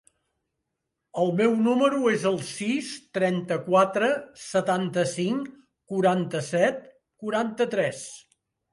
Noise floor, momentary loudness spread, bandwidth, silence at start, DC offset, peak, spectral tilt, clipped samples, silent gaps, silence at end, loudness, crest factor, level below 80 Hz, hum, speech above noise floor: -82 dBFS; 11 LU; 11.5 kHz; 1.15 s; under 0.1%; -8 dBFS; -5.5 dB/octave; under 0.1%; none; 0.55 s; -25 LUFS; 18 dB; -72 dBFS; none; 58 dB